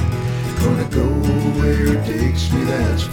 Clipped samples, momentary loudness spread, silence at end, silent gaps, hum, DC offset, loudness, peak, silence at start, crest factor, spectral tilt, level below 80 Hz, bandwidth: under 0.1%; 3 LU; 0 s; none; none; under 0.1%; -18 LUFS; -4 dBFS; 0 s; 12 dB; -6.5 dB/octave; -24 dBFS; 18.5 kHz